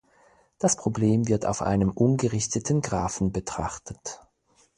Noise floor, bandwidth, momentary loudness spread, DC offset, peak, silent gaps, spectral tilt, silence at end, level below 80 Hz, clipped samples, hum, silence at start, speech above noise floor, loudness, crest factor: -64 dBFS; 11.5 kHz; 14 LU; under 0.1%; -8 dBFS; none; -5.5 dB/octave; 0.6 s; -46 dBFS; under 0.1%; none; 0.6 s; 39 dB; -25 LUFS; 18 dB